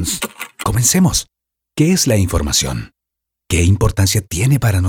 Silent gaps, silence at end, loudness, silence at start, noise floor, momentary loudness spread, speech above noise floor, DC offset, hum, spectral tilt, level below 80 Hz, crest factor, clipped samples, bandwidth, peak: none; 0 s; -15 LUFS; 0 s; -81 dBFS; 10 LU; 66 dB; under 0.1%; none; -4.5 dB/octave; -32 dBFS; 16 dB; under 0.1%; 19 kHz; 0 dBFS